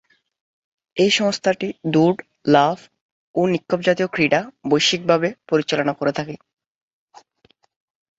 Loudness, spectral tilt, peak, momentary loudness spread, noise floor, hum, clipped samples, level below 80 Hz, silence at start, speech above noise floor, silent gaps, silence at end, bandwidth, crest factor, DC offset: -19 LUFS; -4.5 dB/octave; -2 dBFS; 10 LU; -61 dBFS; none; under 0.1%; -62 dBFS; 0.95 s; 42 dB; 3.01-3.34 s; 1.85 s; 8 kHz; 20 dB; under 0.1%